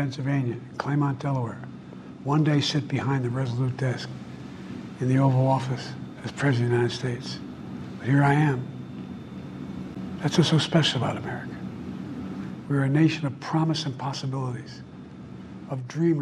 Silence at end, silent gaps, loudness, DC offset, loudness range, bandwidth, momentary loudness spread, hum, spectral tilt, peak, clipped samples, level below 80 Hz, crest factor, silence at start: 0 s; none; -26 LUFS; under 0.1%; 2 LU; 11 kHz; 17 LU; none; -6.5 dB/octave; -6 dBFS; under 0.1%; -58 dBFS; 20 dB; 0 s